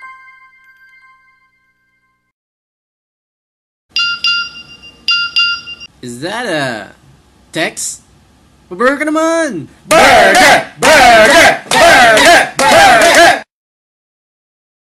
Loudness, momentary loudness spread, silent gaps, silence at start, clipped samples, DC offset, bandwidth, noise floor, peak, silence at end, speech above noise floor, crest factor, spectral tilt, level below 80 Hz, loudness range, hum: -8 LUFS; 18 LU; 2.32-3.89 s; 0.05 s; under 0.1%; under 0.1%; 16.5 kHz; -60 dBFS; 0 dBFS; 1.55 s; 51 dB; 12 dB; -2 dB/octave; -42 dBFS; 14 LU; 60 Hz at -50 dBFS